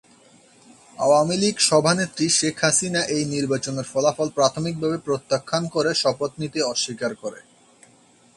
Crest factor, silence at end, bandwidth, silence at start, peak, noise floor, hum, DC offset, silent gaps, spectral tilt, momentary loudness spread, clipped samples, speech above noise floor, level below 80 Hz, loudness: 20 dB; 0.95 s; 11.5 kHz; 1 s; -4 dBFS; -55 dBFS; none; under 0.1%; none; -3.5 dB/octave; 8 LU; under 0.1%; 33 dB; -62 dBFS; -21 LUFS